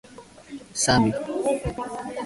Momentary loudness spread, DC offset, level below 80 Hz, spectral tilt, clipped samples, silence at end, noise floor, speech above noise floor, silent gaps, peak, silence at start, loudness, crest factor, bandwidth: 17 LU; under 0.1%; -46 dBFS; -4 dB/octave; under 0.1%; 0 s; -45 dBFS; 21 dB; none; -6 dBFS; 0.1 s; -24 LUFS; 20 dB; 11.5 kHz